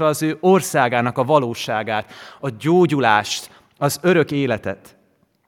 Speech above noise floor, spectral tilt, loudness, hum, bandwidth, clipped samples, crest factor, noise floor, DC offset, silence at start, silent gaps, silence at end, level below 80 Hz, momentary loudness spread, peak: 42 dB; -5 dB/octave; -18 LUFS; none; 17 kHz; under 0.1%; 18 dB; -61 dBFS; under 0.1%; 0 s; none; 0.7 s; -64 dBFS; 12 LU; 0 dBFS